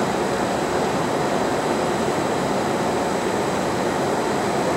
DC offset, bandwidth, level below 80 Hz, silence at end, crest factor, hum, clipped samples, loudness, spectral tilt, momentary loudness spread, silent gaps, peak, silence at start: under 0.1%; 16 kHz; -50 dBFS; 0 s; 14 dB; none; under 0.1%; -22 LUFS; -4.5 dB/octave; 1 LU; none; -8 dBFS; 0 s